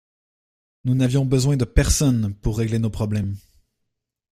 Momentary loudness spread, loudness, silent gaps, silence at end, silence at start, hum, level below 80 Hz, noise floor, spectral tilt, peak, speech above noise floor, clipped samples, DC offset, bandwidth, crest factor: 8 LU; -21 LUFS; none; 0.95 s; 0.85 s; none; -32 dBFS; -78 dBFS; -6 dB/octave; -2 dBFS; 58 dB; under 0.1%; under 0.1%; 15.5 kHz; 20 dB